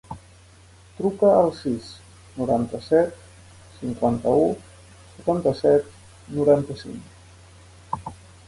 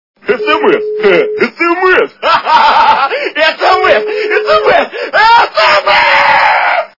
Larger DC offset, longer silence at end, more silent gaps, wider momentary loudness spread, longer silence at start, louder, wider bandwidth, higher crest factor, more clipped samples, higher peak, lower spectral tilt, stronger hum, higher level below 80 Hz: second, under 0.1% vs 0.1%; first, 0.35 s vs 0.15 s; neither; first, 21 LU vs 6 LU; second, 0.1 s vs 0.25 s; second, -22 LUFS vs -8 LUFS; first, 11.5 kHz vs 6 kHz; first, 18 dB vs 8 dB; second, under 0.1% vs 2%; second, -6 dBFS vs 0 dBFS; first, -7.5 dB/octave vs -3.5 dB/octave; neither; second, -52 dBFS vs -46 dBFS